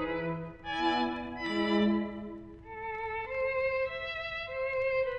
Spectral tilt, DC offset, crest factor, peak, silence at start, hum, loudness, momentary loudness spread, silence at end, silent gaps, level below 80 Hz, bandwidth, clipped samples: -6.5 dB/octave; under 0.1%; 18 dB; -16 dBFS; 0 s; none; -33 LUFS; 11 LU; 0 s; none; -56 dBFS; 8.4 kHz; under 0.1%